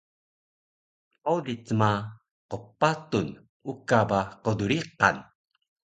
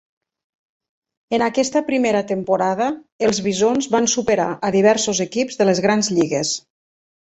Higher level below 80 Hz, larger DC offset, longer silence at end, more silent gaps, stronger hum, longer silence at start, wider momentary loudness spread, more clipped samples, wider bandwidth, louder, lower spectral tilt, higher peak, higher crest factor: about the same, -58 dBFS vs -58 dBFS; neither; about the same, 0.65 s vs 0.7 s; first, 2.31-2.49 s, 3.49-3.60 s vs 3.12-3.19 s; neither; about the same, 1.25 s vs 1.3 s; first, 16 LU vs 6 LU; neither; first, 9.2 kHz vs 8.2 kHz; second, -27 LUFS vs -19 LUFS; first, -6 dB/octave vs -4 dB/octave; about the same, -4 dBFS vs -2 dBFS; first, 26 dB vs 18 dB